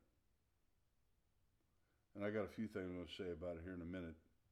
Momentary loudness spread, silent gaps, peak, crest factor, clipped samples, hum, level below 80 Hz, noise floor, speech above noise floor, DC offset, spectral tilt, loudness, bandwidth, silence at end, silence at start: 10 LU; none; -30 dBFS; 20 dB; under 0.1%; none; -72 dBFS; -83 dBFS; 35 dB; under 0.1%; -7 dB/octave; -49 LUFS; 13.5 kHz; 0.3 s; 2.15 s